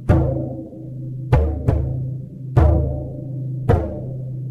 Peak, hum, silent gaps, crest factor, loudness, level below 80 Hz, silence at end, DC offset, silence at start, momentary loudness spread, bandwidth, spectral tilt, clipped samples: 0 dBFS; none; none; 20 dB; -21 LUFS; -26 dBFS; 0 s; under 0.1%; 0 s; 13 LU; 4.7 kHz; -10 dB/octave; under 0.1%